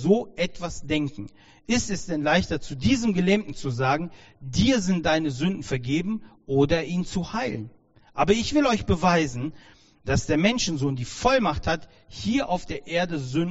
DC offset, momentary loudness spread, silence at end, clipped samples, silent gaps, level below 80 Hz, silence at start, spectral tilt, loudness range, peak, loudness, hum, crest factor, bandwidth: under 0.1%; 11 LU; 0 s; under 0.1%; none; -42 dBFS; 0 s; -5 dB/octave; 2 LU; -6 dBFS; -25 LUFS; none; 18 dB; 8 kHz